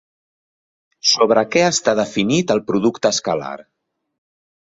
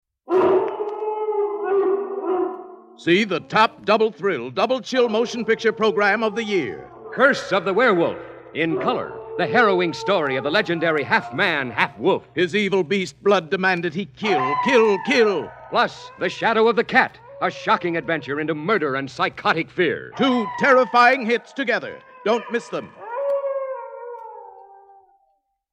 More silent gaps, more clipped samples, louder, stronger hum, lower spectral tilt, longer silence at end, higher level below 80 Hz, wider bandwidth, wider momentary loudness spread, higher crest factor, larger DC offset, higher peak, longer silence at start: neither; neither; first, -17 LUFS vs -20 LUFS; neither; second, -3.5 dB/octave vs -5 dB/octave; about the same, 1.15 s vs 1.1 s; first, -58 dBFS vs -64 dBFS; second, 7.8 kHz vs 9.8 kHz; about the same, 9 LU vs 10 LU; about the same, 18 dB vs 20 dB; neither; about the same, -2 dBFS vs 0 dBFS; first, 1.05 s vs 0.3 s